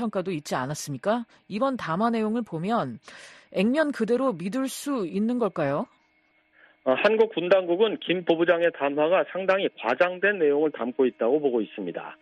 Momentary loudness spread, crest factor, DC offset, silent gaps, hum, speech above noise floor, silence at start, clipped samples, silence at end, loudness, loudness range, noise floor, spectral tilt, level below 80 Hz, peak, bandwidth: 10 LU; 18 dB; under 0.1%; none; none; 41 dB; 0 s; under 0.1%; 0.05 s; -25 LUFS; 5 LU; -66 dBFS; -5.5 dB/octave; -70 dBFS; -6 dBFS; 12.5 kHz